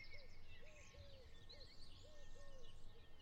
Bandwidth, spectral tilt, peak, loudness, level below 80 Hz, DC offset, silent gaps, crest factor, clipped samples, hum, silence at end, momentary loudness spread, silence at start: 9 kHz; -3.5 dB/octave; -42 dBFS; -63 LUFS; -60 dBFS; under 0.1%; none; 12 dB; under 0.1%; none; 0 s; 4 LU; 0 s